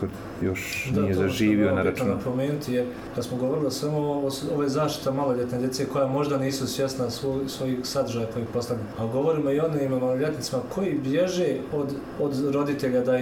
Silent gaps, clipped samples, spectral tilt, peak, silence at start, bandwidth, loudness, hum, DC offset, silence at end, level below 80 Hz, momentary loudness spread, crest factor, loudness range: none; under 0.1%; -6 dB/octave; -12 dBFS; 0 s; 19.5 kHz; -26 LUFS; none; under 0.1%; 0 s; -54 dBFS; 6 LU; 14 dB; 2 LU